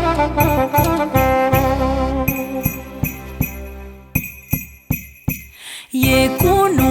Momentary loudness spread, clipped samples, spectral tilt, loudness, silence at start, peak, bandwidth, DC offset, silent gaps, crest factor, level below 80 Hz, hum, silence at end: 11 LU; under 0.1%; -5.5 dB/octave; -18 LUFS; 0 s; -2 dBFS; over 20 kHz; under 0.1%; none; 16 dB; -30 dBFS; none; 0 s